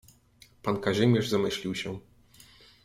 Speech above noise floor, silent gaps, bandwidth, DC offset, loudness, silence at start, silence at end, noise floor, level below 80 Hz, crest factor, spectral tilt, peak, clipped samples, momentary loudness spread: 32 dB; none; 16 kHz; under 0.1%; -28 LUFS; 0.65 s; 0.85 s; -59 dBFS; -60 dBFS; 20 dB; -6 dB/octave; -10 dBFS; under 0.1%; 13 LU